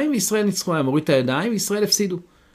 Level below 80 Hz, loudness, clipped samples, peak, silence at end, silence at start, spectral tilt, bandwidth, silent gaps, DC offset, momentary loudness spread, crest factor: -62 dBFS; -20 LUFS; under 0.1%; -6 dBFS; 0.35 s; 0 s; -4 dB/octave; 15.5 kHz; none; under 0.1%; 3 LU; 16 dB